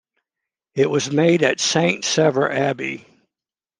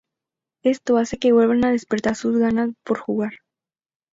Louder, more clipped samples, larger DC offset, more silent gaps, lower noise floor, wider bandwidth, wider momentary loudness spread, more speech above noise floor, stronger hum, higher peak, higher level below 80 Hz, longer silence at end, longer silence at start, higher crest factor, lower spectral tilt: about the same, -19 LUFS vs -20 LUFS; neither; neither; neither; about the same, -90 dBFS vs -89 dBFS; first, 10.5 kHz vs 7.8 kHz; about the same, 11 LU vs 9 LU; about the same, 71 dB vs 70 dB; neither; first, -2 dBFS vs -6 dBFS; second, -66 dBFS vs -56 dBFS; about the same, 0.8 s vs 0.75 s; about the same, 0.75 s vs 0.65 s; about the same, 18 dB vs 14 dB; second, -4 dB/octave vs -6 dB/octave